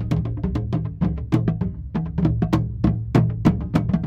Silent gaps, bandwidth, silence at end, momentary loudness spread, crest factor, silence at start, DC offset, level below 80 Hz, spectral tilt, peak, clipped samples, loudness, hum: none; 8 kHz; 0 s; 6 LU; 18 dB; 0 s; under 0.1%; -32 dBFS; -9 dB/octave; -2 dBFS; under 0.1%; -22 LUFS; none